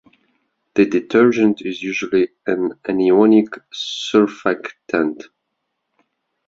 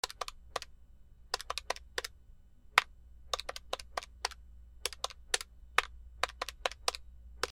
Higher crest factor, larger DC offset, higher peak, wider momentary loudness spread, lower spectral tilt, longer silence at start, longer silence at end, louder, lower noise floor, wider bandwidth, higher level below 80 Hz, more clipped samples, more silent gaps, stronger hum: second, 16 dB vs 38 dB; neither; about the same, -2 dBFS vs -2 dBFS; second, 11 LU vs 15 LU; first, -5.5 dB/octave vs 0 dB/octave; first, 0.75 s vs 0.05 s; first, 1.25 s vs 0 s; first, -18 LUFS vs -37 LUFS; first, -75 dBFS vs -57 dBFS; second, 7.6 kHz vs 19.5 kHz; about the same, -60 dBFS vs -56 dBFS; neither; neither; neither